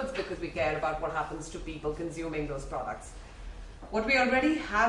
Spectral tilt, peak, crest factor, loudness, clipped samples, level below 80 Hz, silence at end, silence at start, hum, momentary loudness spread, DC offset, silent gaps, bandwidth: -5 dB/octave; -14 dBFS; 18 dB; -31 LUFS; under 0.1%; -46 dBFS; 0 s; 0 s; none; 22 LU; under 0.1%; none; 11.5 kHz